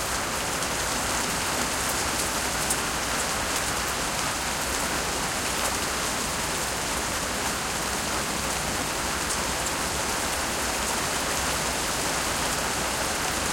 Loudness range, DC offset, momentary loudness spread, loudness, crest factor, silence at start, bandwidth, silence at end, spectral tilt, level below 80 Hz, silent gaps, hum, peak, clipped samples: 1 LU; under 0.1%; 2 LU; -26 LUFS; 18 dB; 0 s; 16.5 kHz; 0 s; -1.5 dB/octave; -42 dBFS; none; none; -10 dBFS; under 0.1%